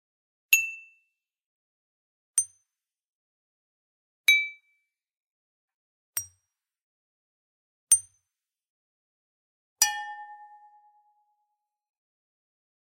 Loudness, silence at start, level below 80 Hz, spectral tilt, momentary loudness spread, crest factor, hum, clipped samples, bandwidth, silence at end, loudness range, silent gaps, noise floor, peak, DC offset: -25 LUFS; 0.5 s; -84 dBFS; 5 dB/octave; 21 LU; 30 dB; none; under 0.1%; 16 kHz; 2.55 s; 7 LU; 1.46-2.34 s, 3.07-4.24 s, 5.17-5.68 s, 5.74-6.13 s, 6.83-7.87 s, 8.69-9.76 s; -87 dBFS; -4 dBFS; under 0.1%